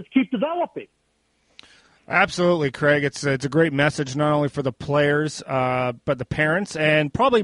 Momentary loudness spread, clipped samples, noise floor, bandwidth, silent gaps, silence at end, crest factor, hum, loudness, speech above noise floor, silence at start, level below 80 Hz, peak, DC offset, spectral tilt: 6 LU; under 0.1%; -67 dBFS; 11.5 kHz; none; 0 s; 18 dB; none; -21 LUFS; 46 dB; 0 s; -52 dBFS; -4 dBFS; under 0.1%; -5.5 dB/octave